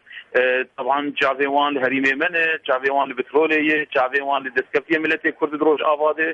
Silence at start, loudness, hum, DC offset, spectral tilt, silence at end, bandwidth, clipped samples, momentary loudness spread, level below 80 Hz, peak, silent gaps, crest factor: 0.1 s; -20 LUFS; none; under 0.1%; -5 dB/octave; 0 s; 7.8 kHz; under 0.1%; 4 LU; -68 dBFS; -6 dBFS; none; 14 dB